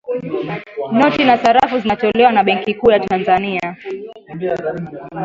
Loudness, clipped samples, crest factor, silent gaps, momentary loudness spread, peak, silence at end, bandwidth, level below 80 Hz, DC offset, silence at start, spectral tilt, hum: -15 LUFS; under 0.1%; 16 dB; none; 16 LU; 0 dBFS; 0 s; 7.8 kHz; -50 dBFS; under 0.1%; 0.05 s; -6 dB/octave; none